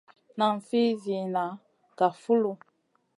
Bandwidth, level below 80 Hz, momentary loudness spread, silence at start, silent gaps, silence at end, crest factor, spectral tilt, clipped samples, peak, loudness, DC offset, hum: 11 kHz; -82 dBFS; 15 LU; 0.35 s; none; 0.65 s; 18 dB; -6.5 dB/octave; under 0.1%; -10 dBFS; -28 LUFS; under 0.1%; none